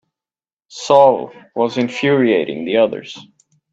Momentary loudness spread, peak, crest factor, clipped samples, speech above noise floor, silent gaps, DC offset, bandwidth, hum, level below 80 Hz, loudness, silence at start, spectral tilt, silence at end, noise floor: 20 LU; 0 dBFS; 16 dB; under 0.1%; over 75 dB; none; under 0.1%; 8 kHz; none; -66 dBFS; -15 LUFS; 0.75 s; -5.5 dB/octave; 0.5 s; under -90 dBFS